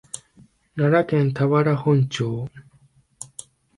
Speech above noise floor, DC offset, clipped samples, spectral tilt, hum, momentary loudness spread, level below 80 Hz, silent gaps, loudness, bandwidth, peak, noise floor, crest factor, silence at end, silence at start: 38 dB; under 0.1%; under 0.1%; -7 dB/octave; none; 18 LU; -58 dBFS; none; -21 LUFS; 11.5 kHz; -6 dBFS; -58 dBFS; 18 dB; 0.5 s; 0.15 s